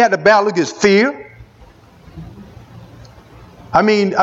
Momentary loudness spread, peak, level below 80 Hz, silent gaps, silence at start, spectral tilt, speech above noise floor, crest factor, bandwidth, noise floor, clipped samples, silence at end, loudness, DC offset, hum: 24 LU; 0 dBFS; -48 dBFS; none; 0 s; -5 dB/octave; 31 dB; 16 dB; 8 kHz; -44 dBFS; under 0.1%; 0 s; -13 LUFS; under 0.1%; none